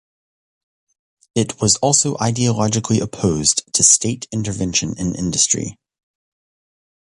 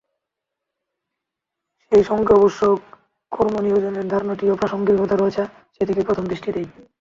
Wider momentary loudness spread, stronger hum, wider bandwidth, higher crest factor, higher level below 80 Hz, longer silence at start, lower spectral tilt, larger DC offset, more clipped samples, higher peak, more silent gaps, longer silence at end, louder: about the same, 11 LU vs 11 LU; neither; first, 11.5 kHz vs 7.4 kHz; about the same, 20 dB vs 18 dB; first, -44 dBFS vs -52 dBFS; second, 1.35 s vs 1.9 s; second, -3.5 dB/octave vs -7.5 dB/octave; neither; neither; first, 0 dBFS vs -4 dBFS; neither; first, 1.45 s vs 0.2 s; about the same, -17 LUFS vs -19 LUFS